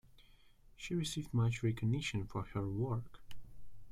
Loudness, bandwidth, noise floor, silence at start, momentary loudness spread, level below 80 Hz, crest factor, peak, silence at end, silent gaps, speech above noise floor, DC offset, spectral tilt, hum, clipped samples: -38 LUFS; 13 kHz; -62 dBFS; 0.15 s; 16 LU; -56 dBFS; 16 dB; -22 dBFS; 0 s; none; 26 dB; under 0.1%; -6 dB/octave; none; under 0.1%